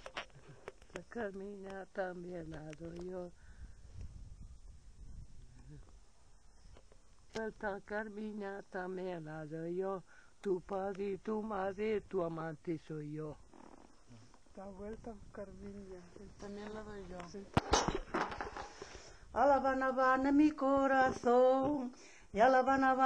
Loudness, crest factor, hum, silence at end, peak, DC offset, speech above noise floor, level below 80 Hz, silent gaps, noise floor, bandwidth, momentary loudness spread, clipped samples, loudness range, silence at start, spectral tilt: -36 LUFS; 22 dB; none; 0 s; -16 dBFS; under 0.1%; 28 dB; -58 dBFS; none; -63 dBFS; 9.6 kHz; 24 LU; under 0.1%; 20 LU; 0 s; -5 dB/octave